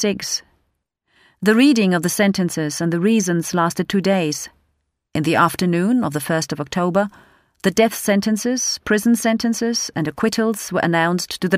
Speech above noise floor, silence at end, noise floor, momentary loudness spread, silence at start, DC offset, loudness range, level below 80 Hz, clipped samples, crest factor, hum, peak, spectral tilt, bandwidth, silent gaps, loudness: 52 dB; 0 s; -70 dBFS; 7 LU; 0 s; under 0.1%; 2 LU; -56 dBFS; under 0.1%; 16 dB; none; -2 dBFS; -4.5 dB/octave; 16 kHz; none; -19 LUFS